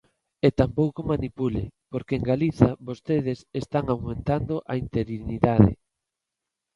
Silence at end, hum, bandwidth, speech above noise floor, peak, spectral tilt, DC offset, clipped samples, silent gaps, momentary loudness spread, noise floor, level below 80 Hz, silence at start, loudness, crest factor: 1 s; none; 10.5 kHz; 61 dB; -2 dBFS; -9 dB/octave; under 0.1%; under 0.1%; none; 11 LU; -85 dBFS; -42 dBFS; 0.45 s; -25 LUFS; 24 dB